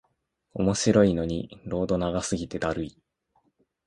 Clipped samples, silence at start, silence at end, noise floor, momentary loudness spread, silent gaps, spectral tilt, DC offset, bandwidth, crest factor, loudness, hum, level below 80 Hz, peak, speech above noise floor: under 0.1%; 0.55 s; 0.95 s; -74 dBFS; 13 LU; none; -5.5 dB/octave; under 0.1%; 11.5 kHz; 20 dB; -26 LUFS; none; -48 dBFS; -6 dBFS; 49 dB